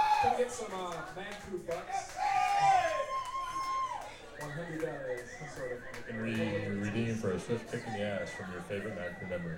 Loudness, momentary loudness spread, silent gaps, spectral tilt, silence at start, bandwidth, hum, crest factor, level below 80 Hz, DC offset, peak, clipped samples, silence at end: -35 LUFS; 13 LU; none; -5 dB/octave; 0 s; 17 kHz; none; 16 dB; -58 dBFS; under 0.1%; -18 dBFS; under 0.1%; 0 s